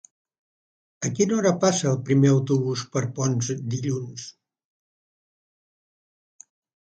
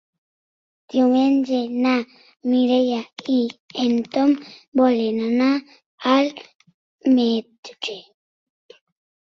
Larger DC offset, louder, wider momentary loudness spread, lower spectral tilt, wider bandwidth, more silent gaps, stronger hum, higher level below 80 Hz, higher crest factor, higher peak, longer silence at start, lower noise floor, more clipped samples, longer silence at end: neither; about the same, -23 LUFS vs -21 LUFS; about the same, 12 LU vs 12 LU; about the same, -5.5 dB/octave vs -5 dB/octave; first, 9 kHz vs 6.8 kHz; second, none vs 2.36-2.40 s, 3.60-3.69 s, 4.68-4.72 s, 5.86-5.98 s, 6.55-6.60 s, 6.74-6.98 s, 7.58-7.63 s; neither; about the same, -66 dBFS vs -68 dBFS; about the same, 18 dB vs 18 dB; about the same, -6 dBFS vs -4 dBFS; about the same, 1 s vs 0.95 s; about the same, under -90 dBFS vs under -90 dBFS; neither; first, 2.6 s vs 1.35 s